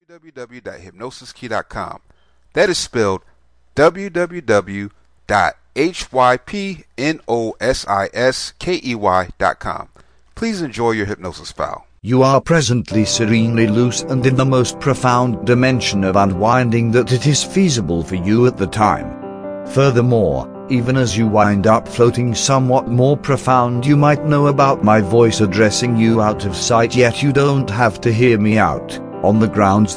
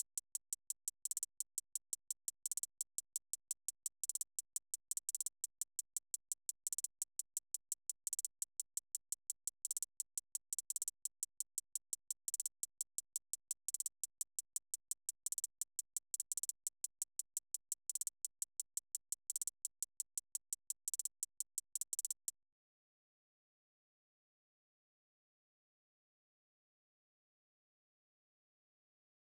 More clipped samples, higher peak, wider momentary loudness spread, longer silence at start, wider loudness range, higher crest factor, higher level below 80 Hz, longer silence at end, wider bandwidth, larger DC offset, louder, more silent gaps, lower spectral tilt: neither; first, 0 dBFS vs -24 dBFS; first, 13 LU vs 4 LU; about the same, 0.15 s vs 0.15 s; first, 6 LU vs 1 LU; second, 14 dB vs 24 dB; first, -42 dBFS vs -90 dBFS; second, 0 s vs 7.15 s; second, 10.5 kHz vs over 20 kHz; neither; first, -15 LUFS vs -43 LUFS; neither; first, -5.5 dB/octave vs 4.5 dB/octave